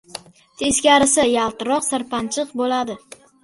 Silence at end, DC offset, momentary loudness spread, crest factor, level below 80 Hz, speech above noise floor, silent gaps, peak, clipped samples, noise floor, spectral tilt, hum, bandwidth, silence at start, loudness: 0.45 s; under 0.1%; 17 LU; 18 dB; -52 dBFS; 21 dB; none; -2 dBFS; under 0.1%; -40 dBFS; -2 dB/octave; none; 12 kHz; 0.15 s; -18 LUFS